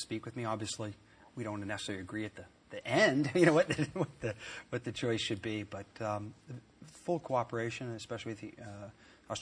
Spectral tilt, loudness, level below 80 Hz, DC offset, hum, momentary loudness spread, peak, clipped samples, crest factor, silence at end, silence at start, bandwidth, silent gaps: -5 dB/octave; -35 LUFS; -68 dBFS; under 0.1%; none; 21 LU; -12 dBFS; under 0.1%; 24 dB; 0 s; 0 s; 10.5 kHz; none